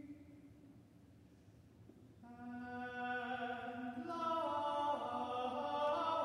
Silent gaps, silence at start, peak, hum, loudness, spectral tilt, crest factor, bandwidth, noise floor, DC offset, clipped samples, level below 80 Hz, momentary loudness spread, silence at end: none; 0 s; -26 dBFS; none; -41 LUFS; -5.5 dB/octave; 16 dB; 14 kHz; -64 dBFS; under 0.1%; under 0.1%; -76 dBFS; 24 LU; 0 s